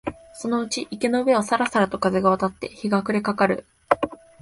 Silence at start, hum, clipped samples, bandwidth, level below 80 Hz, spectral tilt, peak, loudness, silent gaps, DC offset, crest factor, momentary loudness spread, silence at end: 0.05 s; none; under 0.1%; 11.5 kHz; -54 dBFS; -5 dB/octave; -2 dBFS; -23 LUFS; none; under 0.1%; 22 dB; 9 LU; 0.25 s